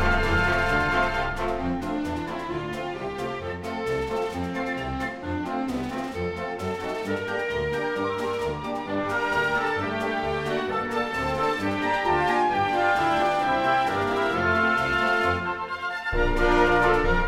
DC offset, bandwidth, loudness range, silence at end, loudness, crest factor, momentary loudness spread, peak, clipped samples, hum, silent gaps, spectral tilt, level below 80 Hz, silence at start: under 0.1%; 16 kHz; 7 LU; 0 s; -25 LUFS; 18 dB; 9 LU; -8 dBFS; under 0.1%; none; none; -5.5 dB/octave; -36 dBFS; 0 s